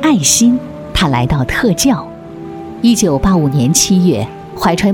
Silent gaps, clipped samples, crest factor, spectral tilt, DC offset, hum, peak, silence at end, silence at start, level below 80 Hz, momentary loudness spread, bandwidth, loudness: none; under 0.1%; 12 dB; -4.5 dB/octave; under 0.1%; none; 0 dBFS; 0 s; 0 s; -30 dBFS; 16 LU; 19.5 kHz; -12 LUFS